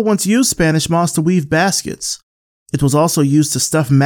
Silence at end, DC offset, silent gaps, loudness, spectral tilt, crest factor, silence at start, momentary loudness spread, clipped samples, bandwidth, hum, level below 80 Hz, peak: 0 s; under 0.1%; 2.23-2.66 s; -15 LUFS; -4.5 dB/octave; 14 dB; 0 s; 9 LU; under 0.1%; 18.5 kHz; none; -42 dBFS; -2 dBFS